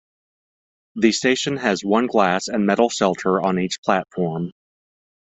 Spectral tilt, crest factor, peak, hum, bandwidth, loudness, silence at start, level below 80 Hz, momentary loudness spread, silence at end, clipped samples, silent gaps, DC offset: -4.5 dB/octave; 20 dB; -2 dBFS; none; 8.4 kHz; -20 LUFS; 0.95 s; -60 dBFS; 7 LU; 0.85 s; under 0.1%; 3.78-3.83 s; under 0.1%